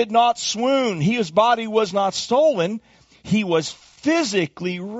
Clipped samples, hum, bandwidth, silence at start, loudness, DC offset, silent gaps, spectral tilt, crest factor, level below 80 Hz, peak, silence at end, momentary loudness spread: under 0.1%; none; 8 kHz; 0 s; -20 LUFS; under 0.1%; none; -4 dB/octave; 16 dB; -60 dBFS; -4 dBFS; 0 s; 8 LU